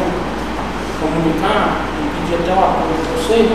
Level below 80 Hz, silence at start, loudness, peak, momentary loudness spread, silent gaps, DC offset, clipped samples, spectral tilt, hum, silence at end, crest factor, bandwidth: -30 dBFS; 0 s; -17 LUFS; 0 dBFS; 7 LU; none; 2%; under 0.1%; -5.5 dB/octave; none; 0 s; 16 dB; 15 kHz